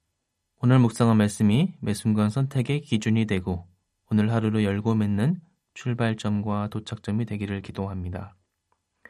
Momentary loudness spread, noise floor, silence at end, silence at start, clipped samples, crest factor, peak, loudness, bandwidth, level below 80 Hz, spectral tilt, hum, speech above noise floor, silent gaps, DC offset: 12 LU; -78 dBFS; 0.8 s; 0.6 s; under 0.1%; 16 dB; -8 dBFS; -25 LUFS; 12.5 kHz; -60 dBFS; -7 dB/octave; none; 55 dB; none; under 0.1%